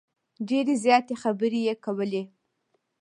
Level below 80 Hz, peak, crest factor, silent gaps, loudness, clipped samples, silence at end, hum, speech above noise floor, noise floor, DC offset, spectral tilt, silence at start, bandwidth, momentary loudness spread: -80 dBFS; -6 dBFS; 20 dB; none; -26 LUFS; under 0.1%; 0.75 s; none; 49 dB; -74 dBFS; under 0.1%; -5 dB/octave; 0.4 s; 11 kHz; 12 LU